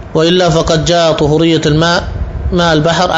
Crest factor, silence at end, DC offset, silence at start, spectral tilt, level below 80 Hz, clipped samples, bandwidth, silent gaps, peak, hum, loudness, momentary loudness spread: 10 dB; 0 s; 0.3%; 0 s; -5 dB/octave; -24 dBFS; under 0.1%; 8 kHz; none; 0 dBFS; none; -11 LUFS; 6 LU